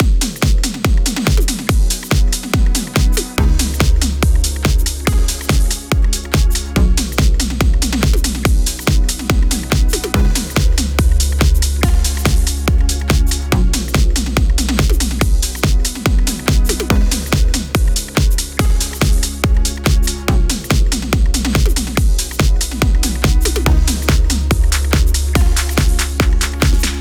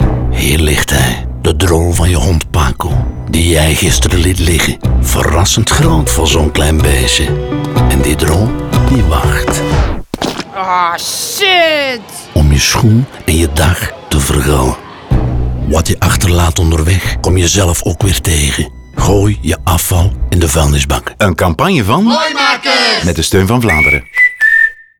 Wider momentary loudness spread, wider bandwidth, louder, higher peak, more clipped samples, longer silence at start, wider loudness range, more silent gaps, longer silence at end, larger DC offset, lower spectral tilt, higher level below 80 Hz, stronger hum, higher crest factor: second, 2 LU vs 7 LU; about the same, 19 kHz vs 20 kHz; second, -16 LUFS vs -11 LUFS; about the same, -2 dBFS vs 0 dBFS; neither; about the same, 0 s vs 0 s; about the same, 1 LU vs 2 LU; neither; second, 0 s vs 0.25 s; second, under 0.1% vs 0.5%; about the same, -4.5 dB/octave vs -4.5 dB/octave; about the same, -14 dBFS vs -18 dBFS; neither; about the same, 12 dB vs 10 dB